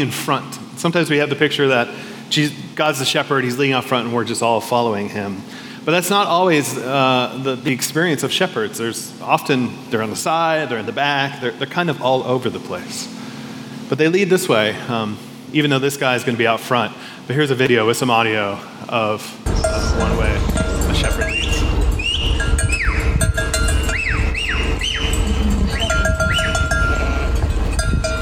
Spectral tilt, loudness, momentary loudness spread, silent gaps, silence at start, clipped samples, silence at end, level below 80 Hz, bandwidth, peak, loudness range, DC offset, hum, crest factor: -4.5 dB/octave; -18 LUFS; 9 LU; none; 0 s; under 0.1%; 0 s; -26 dBFS; 18 kHz; 0 dBFS; 2 LU; under 0.1%; none; 18 dB